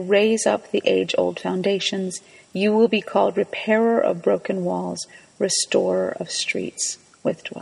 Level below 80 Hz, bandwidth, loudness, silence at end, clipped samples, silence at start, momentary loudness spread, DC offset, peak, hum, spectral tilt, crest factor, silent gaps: -68 dBFS; 11.5 kHz; -22 LUFS; 0 s; under 0.1%; 0 s; 9 LU; under 0.1%; -4 dBFS; none; -3.5 dB/octave; 18 dB; none